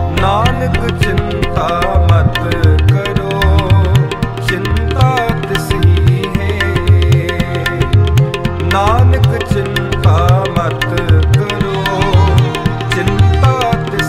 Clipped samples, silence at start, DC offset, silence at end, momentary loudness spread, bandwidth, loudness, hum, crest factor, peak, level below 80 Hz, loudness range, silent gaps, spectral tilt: under 0.1%; 0 s; under 0.1%; 0 s; 6 LU; 15.5 kHz; -12 LUFS; none; 12 dB; 0 dBFS; -20 dBFS; 1 LU; none; -6.5 dB/octave